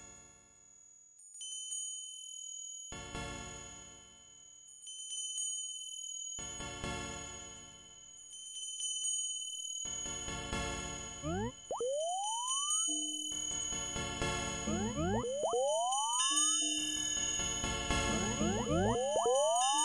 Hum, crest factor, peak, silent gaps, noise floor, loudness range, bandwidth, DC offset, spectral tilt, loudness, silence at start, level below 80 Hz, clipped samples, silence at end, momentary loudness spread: none; 20 dB; -16 dBFS; none; -61 dBFS; 11 LU; 11.5 kHz; under 0.1%; -2 dB/octave; -35 LUFS; 0 s; -54 dBFS; under 0.1%; 0 s; 18 LU